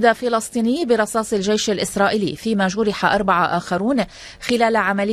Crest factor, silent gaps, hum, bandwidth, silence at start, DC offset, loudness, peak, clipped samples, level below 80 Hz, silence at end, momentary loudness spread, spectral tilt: 18 dB; none; none; 14 kHz; 0 s; under 0.1%; -19 LUFS; -2 dBFS; under 0.1%; -50 dBFS; 0 s; 5 LU; -4.5 dB/octave